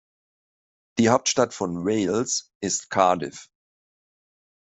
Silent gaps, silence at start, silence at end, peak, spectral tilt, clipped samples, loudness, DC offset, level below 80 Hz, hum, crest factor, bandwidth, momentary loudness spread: 2.55-2.60 s; 0.95 s; 1.25 s; -4 dBFS; -3.5 dB/octave; under 0.1%; -23 LUFS; under 0.1%; -64 dBFS; none; 22 dB; 8.4 kHz; 8 LU